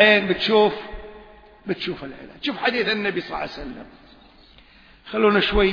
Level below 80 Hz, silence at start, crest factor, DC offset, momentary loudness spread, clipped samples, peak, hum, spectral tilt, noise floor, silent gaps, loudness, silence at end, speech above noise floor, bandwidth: -40 dBFS; 0 s; 22 dB; under 0.1%; 20 LU; under 0.1%; 0 dBFS; none; -6 dB/octave; -50 dBFS; none; -21 LUFS; 0 s; 29 dB; 5.4 kHz